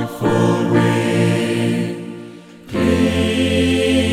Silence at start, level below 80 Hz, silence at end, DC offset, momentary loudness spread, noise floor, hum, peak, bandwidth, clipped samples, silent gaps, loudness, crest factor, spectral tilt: 0 s; -40 dBFS; 0 s; under 0.1%; 12 LU; -37 dBFS; none; -2 dBFS; 15.5 kHz; under 0.1%; none; -17 LUFS; 14 dB; -6 dB/octave